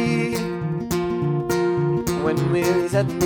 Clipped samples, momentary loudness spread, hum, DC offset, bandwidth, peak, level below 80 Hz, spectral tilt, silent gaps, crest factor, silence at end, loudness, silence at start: under 0.1%; 5 LU; none; under 0.1%; over 20 kHz; -8 dBFS; -46 dBFS; -6.5 dB/octave; none; 14 dB; 0 s; -22 LUFS; 0 s